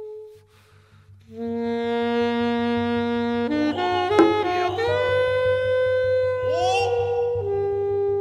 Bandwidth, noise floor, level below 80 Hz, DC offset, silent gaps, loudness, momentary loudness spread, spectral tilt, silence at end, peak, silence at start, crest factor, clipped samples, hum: 10.5 kHz; -54 dBFS; -54 dBFS; under 0.1%; none; -22 LUFS; 5 LU; -6 dB/octave; 0 s; -2 dBFS; 0 s; 22 dB; under 0.1%; none